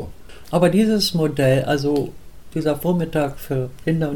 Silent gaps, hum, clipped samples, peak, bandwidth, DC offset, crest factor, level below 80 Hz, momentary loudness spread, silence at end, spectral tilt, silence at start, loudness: none; none; under 0.1%; -6 dBFS; 18 kHz; 1%; 14 dB; -42 dBFS; 9 LU; 0 s; -6 dB/octave; 0 s; -20 LUFS